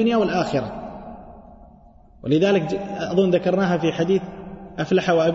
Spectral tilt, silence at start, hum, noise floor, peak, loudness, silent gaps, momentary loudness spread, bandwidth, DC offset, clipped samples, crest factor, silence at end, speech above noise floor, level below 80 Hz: -7 dB/octave; 0 s; none; -48 dBFS; -8 dBFS; -21 LUFS; none; 18 LU; 8 kHz; under 0.1%; under 0.1%; 14 dB; 0 s; 29 dB; -50 dBFS